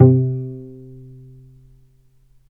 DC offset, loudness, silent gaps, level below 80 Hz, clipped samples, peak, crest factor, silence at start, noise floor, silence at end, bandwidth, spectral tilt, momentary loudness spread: under 0.1%; -19 LUFS; none; -52 dBFS; under 0.1%; 0 dBFS; 20 dB; 0 s; -53 dBFS; 1.75 s; 1.5 kHz; -14.5 dB/octave; 27 LU